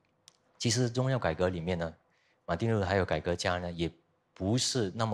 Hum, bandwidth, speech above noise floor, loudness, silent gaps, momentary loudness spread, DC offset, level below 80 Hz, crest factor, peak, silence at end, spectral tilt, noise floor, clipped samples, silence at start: none; 13.5 kHz; 34 dB; -31 LUFS; none; 9 LU; under 0.1%; -54 dBFS; 18 dB; -14 dBFS; 0 s; -5 dB/octave; -64 dBFS; under 0.1%; 0.6 s